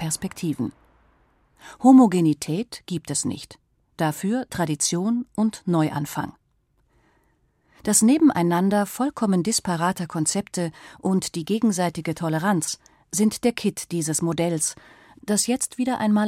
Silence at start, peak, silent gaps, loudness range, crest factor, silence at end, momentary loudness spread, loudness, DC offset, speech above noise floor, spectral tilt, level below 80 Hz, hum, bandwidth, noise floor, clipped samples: 0 s; -4 dBFS; none; 4 LU; 18 dB; 0 s; 12 LU; -23 LUFS; under 0.1%; 44 dB; -4.5 dB/octave; -60 dBFS; none; 16.5 kHz; -66 dBFS; under 0.1%